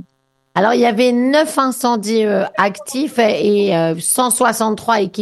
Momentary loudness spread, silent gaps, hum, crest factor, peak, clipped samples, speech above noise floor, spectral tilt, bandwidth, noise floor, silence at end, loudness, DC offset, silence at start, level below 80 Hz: 5 LU; none; none; 16 dB; 0 dBFS; under 0.1%; 49 dB; -4 dB/octave; 13 kHz; -64 dBFS; 0 s; -15 LUFS; under 0.1%; 0.55 s; -62 dBFS